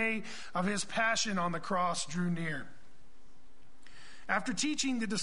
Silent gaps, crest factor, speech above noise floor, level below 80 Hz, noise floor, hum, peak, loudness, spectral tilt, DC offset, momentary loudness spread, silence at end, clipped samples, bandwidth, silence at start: none; 20 dB; 30 dB; -64 dBFS; -63 dBFS; none; -16 dBFS; -33 LUFS; -3.5 dB/octave; 1%; 10 LU; 0 s; under 0.1%; 10.5 kHz; 0 s